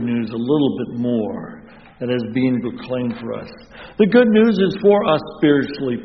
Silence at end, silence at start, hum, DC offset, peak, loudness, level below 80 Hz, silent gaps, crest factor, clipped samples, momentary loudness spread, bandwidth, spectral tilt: 0 s; 0 s; none; 0.1%; 0 dBFS; -18 LUFS; -54 dBFS; none; 18 dB; under 0.1%; 17 LU; 6 kHz; -5.5 dB/octave